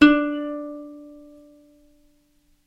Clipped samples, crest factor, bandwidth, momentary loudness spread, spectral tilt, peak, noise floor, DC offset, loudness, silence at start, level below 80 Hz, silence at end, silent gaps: under 0.1%; 24 dB; 7.4 kHz; 26 LU; -5 dB/octave; 0 dBFS; -62 dBFS; under 0.1%; -23 LUFS; 0 s; -54 dBFS; 1.55 s; none